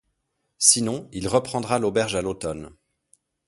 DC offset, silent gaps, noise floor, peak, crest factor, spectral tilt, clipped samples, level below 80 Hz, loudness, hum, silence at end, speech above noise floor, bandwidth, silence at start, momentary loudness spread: under 0.1%; none; -75 dBFS; 0 dBFS; 24 dB; -3 dB/octave; under 0.1%; -52 dBFS; -22 LUFS; none; 0.8 s; 52 dB; 12 kHz; 0.6 s; 14 LU